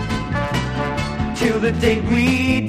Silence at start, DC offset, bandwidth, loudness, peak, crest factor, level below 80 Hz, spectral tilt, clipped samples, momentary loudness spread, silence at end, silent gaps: 0 s; under 0.1%; 15 kHz; -19 LUFS; -4 dBFS; 14 dB; -32 dBFS; -6 dB/octave; under 0.1%; 6 LU; 0 s; none